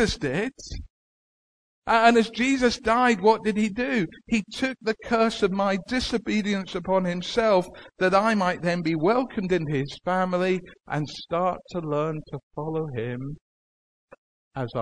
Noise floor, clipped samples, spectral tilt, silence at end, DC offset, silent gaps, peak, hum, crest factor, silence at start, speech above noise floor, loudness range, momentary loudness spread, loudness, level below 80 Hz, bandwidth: under -90 dBFS; under 0.1%; -5.5 dB/octave; 0 s; 0.2%; 0.90-1.82 s, 12.43-12.51 s, 13.41-14.08 s, 14.18-14.51 s; -6 dBFS; none; 20 dB; 0 s; over 66 dB; 8 LU; 12 LU; -24 LUFS; -50 dBFS; 11 kHz